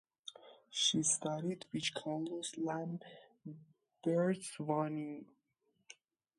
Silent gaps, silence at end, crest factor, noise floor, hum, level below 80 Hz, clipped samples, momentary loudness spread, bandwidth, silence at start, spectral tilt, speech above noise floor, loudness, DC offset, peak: none; 0.45 s; 20 dB; -81 dBFS; none; -84 dBFS; under 0.1%; 20 LU; 11.5 kHz; 0.25 s; -3.5 dB/octave; 43 dB; -37 LUFS; under 0.1%; -20 dBFS